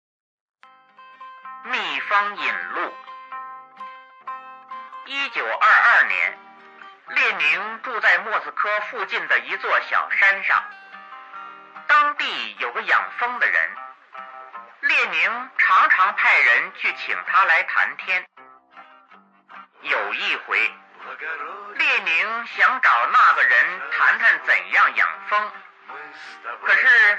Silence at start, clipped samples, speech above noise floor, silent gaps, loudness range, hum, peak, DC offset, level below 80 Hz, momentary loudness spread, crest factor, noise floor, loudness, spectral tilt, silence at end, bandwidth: 1 s; under 0.1%; 32 dB; none; 9 LU; none; -6 dBFS; under 0.1%; -88 dBFS; 23 LU; 16 dB; -53 dBFS; -18 LUFS; -1 dB/octave; 0 s; 8.6 kHz